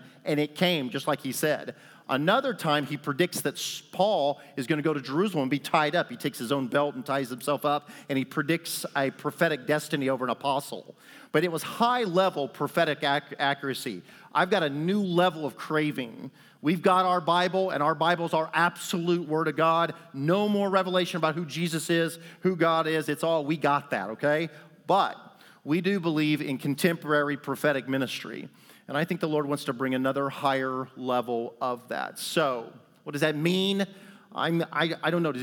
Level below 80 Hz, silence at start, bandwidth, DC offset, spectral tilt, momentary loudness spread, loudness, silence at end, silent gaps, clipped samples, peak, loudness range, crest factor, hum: -86 dBFS; 0 s; 20 kHz; under 0.1%; -5 dB/octave; 8 LU; -27 LUFS; 0 s; none; under 0.1%; -8 dBFS; 3 LU; 20 dB; none